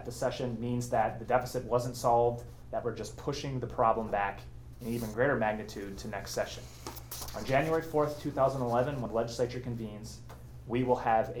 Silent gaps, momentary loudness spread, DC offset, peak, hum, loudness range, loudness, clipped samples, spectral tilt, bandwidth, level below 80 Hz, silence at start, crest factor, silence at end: none; 14 LU; under 0.1%; -12 dBFS; none; 2 LU; -32 LUFS; under 0.1%; -5.5 dB/octave; over 20 kHz; -52 dBFS; 0 s; 20 dB; 0 s